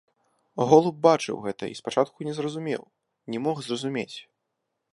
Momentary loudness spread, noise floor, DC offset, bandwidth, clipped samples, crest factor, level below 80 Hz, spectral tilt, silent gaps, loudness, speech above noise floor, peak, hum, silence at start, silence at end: 15 LU; -80 dBFS; under 0.1%; 11.5 kHz; under 0.1%; 22 dB; -70 dBFS; -5.5 dB/octave; none; -25 LUFS; 56 dB; -4 dBFS; none; 0.55 s; 0.7 s